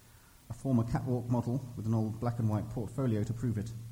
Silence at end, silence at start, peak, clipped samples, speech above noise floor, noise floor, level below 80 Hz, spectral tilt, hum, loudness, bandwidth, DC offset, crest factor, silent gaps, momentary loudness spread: 0 s; 0.5 s; -16 dBFS; under 0.1%; 26 dB; -58 dBFS; -54 dBFS; -8.5 dB/octave; none; -34 LUFS; 16 kHz; under 0.1%; 16 dB; none; 6 LU